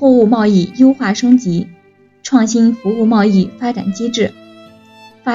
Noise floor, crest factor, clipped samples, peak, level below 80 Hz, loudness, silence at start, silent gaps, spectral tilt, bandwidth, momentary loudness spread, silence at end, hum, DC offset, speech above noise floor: -48 dBFS; 12 dB; under 0.1%; 0 dBFS; -56 dBFS; -13 LUFS; 0 s; none; -6 dB/octave; 7.6 kHz; 9 LU; 0 s; none; under 0.1%; 36 dB